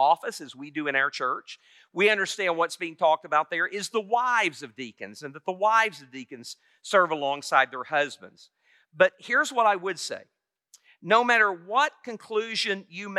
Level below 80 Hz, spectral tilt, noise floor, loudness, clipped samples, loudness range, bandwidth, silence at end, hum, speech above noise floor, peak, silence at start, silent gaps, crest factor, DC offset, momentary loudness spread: under -90 dBFS; -2.5 dB/octave; -61 dBFS; -25 LUFS; under 0.1%; 2 LU; 14 kHz; 0 s; none; 35 dB; -6 dBFS; 0 s; none; 20 dB; under 0.1%; 18 LU